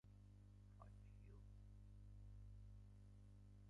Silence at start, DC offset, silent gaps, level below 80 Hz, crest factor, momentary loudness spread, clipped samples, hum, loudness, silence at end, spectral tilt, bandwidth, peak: 0.05 s; under 0.1%; none; -66 dBFS; 12 dB; 4 LU; under 0.1%; 50 Hz at -60 dBFS; -65 LUFS; 0 s; -8 dB/octave; 10.5 kHz; -50 dBFS